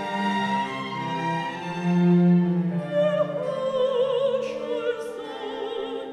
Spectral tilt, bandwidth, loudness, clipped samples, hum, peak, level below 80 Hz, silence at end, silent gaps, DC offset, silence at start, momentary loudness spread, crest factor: -7.5 dB/octave; 9.8 kHz; -25 LUFS; under 0.1%; none; -10 dBFS; -68 dBFS; 0 s; none; under 0.1%; 0 s; 11 LU; 14 dB